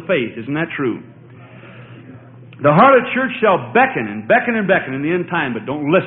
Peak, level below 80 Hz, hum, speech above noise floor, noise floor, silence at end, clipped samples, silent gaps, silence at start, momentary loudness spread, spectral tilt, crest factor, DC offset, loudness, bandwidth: 0 dBFS; -56 dBFS; none; 24 dB; -39 dBFS; 0 s; under 0.1%; none; 0 s; 11 LU; -10 dB/octave; 18 dB; under 0.1%; -16 LUFS; 4.5 kHz